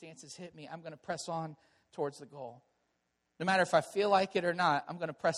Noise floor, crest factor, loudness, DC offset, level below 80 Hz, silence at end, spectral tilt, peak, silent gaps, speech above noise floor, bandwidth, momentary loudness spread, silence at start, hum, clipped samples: -81 dBFS; 20 dB; -32 LUFS; under 0.1%; -78 dBFS; 0 s; -4.5 dB/octave; -14 dBFS; none; 47 dB; 12.5 kHz; 19 LU; 0 s; none; under 0.1%